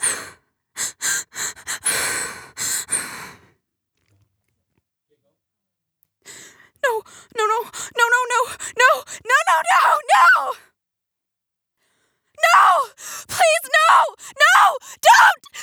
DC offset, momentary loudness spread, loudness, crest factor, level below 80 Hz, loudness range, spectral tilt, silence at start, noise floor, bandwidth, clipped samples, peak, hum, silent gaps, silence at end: under 0.1%; 16 LU; -17 LUFS; 20 dB; -66 dBFS; 13 LU; 1 dB/octave; 0 s; -83 dBFS; over 20 kHz; under 0.1%; 0 dBFS; none; none; 0 s